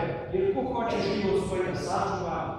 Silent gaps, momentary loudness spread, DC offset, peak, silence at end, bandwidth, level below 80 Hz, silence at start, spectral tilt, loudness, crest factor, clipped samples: none; 3 LU; under 0.1%; -14 dBFS; 0 s; 11.5 kHz; -50 dBFS; 0 s; -6 dB/octave; -28 LUFS; 14 dB; under 0.1%